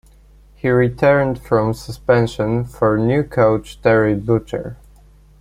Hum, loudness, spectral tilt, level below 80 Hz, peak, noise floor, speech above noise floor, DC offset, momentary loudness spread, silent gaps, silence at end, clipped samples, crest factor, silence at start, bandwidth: 50 Hz at -40 dBFS; -17 LUFS; -8 dB/octave; -42 dBFS; -2 dBFS; -47 dBFS; 30 dB; under 0.1%; 9 LU; none; 0.65 s; under 0.1%; 16 dB; 0.65 s; 14.5 kHz